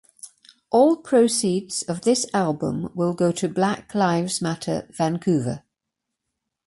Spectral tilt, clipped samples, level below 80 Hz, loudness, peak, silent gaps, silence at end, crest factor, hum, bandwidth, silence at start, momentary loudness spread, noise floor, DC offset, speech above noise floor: -5 dB/octave; under 0.1%; -60 dBFS; -22 LUFS; -6 dBFS; none; 1.1 s; 16 dB; none; 11.5 kHz; 0.25 s; 9 LU; -83 dBFS; under 0.1%; 61 dB